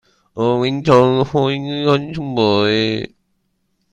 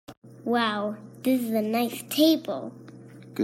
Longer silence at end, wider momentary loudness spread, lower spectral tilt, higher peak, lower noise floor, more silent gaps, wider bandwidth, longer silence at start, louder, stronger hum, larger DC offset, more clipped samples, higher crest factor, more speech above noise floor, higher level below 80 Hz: first, 0.85 s vs 0 s; second, 10 LU vs 18 LU; first, -7 dB/octave vs -4.5 dB/octave; first, 0 dBFS vs -10 dBFS; first, -67 dBFS vs -46 dBFS; second, none vs 0.17-0.22 s; second, 9.8 kHz vs 16.5 kHz; first, 0.35 s vs 0.1 s; first, -16 LUFS vs -26 LUFS; neither; neither; neither; about the same, 18 dB vs 18 dB; first, 51 dB vs 21 dB; first, -50 dBFS vs -76 dBFS